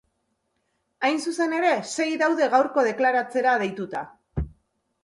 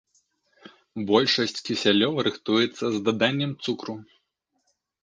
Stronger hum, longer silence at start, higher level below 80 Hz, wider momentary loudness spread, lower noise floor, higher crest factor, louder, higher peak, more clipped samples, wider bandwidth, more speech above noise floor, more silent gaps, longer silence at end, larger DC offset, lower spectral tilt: neither; first, 1 s vs 0.65 s; first, -46 dBFS vs -68 dBFS; about the same, 13 LU vs 13 LU; about the same, -74 dBFS vs -75 dBFS; second, 16 dB vs 22 dB; about the same, -23 LUFS vs -24 LUFS; second, -8 dBFS vs -4 dBFS; neither; first, 11.5 kHz vs 9.6 kHz; about the same, 51 dB vs 51 dB; neither; second, 0.55 s vs 1 s; neither; about the same, -4.5 dB/octave vs -5 dB/octave